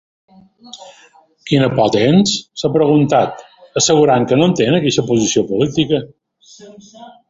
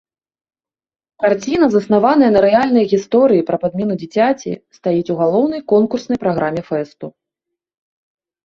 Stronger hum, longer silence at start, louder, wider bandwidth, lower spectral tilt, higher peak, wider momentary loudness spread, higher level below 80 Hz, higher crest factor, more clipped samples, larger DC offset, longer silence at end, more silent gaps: neither; second, 0.75 s vs 1.2 s; about the same, -14 LUFS vs -15 LUFS; about the same, 8 kHz vs 7.4 kHz; second, -5 dB/octave vs -7 dB/octave; about the same, 0 dBFS vs 0 dBFS; about the same, 12 LU vs 11 LU; about the same, -50 dBFS vs -54 dBFS; about the same, 14 dB vs 16 dB; neither; neither; second, 0.2 s vs 1.35 s; neither